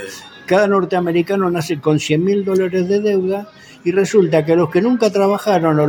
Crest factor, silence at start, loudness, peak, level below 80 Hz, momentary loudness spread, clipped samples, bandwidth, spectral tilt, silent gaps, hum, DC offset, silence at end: 14 dB; 0 s; -16 LUFS; -2 dBFS; -58 dBFS; 5 LU; under 0.1%; 17 kHz; -6.5 dB/octave; none; none; under 0.1%; 0 s